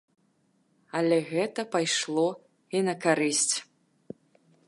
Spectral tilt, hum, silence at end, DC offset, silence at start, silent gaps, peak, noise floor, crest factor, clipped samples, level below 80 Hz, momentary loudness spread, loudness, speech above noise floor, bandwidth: -3 dB/octave; none; 1.05 s; under 0.1%; 0.95 s; none; -10 dBFS; -69 dBFS; 18 dB; under 0.1%; -82 dBFS; 23 LU; -27 LUFS; 42 dB; 11.5 kHz